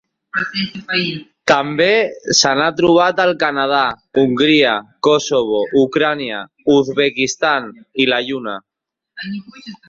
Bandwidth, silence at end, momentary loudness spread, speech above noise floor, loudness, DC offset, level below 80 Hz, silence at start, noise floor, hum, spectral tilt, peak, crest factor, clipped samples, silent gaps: 7.8 kHz; 0.15 s; 12 LU; 36 dB; -15 LUFS; under 0.1%; -56 dBFS; 0.35 s; -52 dBFS; none; -3.5 dB/octave; 0 dBFS; 16 dB; under 0.1%; none